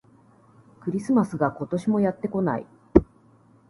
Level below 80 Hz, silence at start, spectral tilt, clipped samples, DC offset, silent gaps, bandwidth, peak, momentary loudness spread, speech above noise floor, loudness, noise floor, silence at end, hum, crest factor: -42 dBFS; 0.85 s; -9 dB/octave; under 0.1%; under 0.1%; none; 11.5 kHz; 0 dBFS; 9 LU; 32 dB; -25 LUFS; -56 dBFS; 0.65 s; none; 26 dB